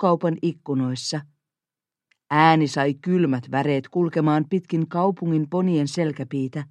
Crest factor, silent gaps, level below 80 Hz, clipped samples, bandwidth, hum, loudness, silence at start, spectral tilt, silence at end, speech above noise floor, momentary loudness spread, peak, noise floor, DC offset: 20 dB; none; -70 dBFS; under 0.1%; 10.5 kHz; none; -22 LUFS; 0 s; -6.5 dB/octave; 0.05 s; 68 dB; 9 LU; -2 dBFS; -89 dBFS; under 0.1%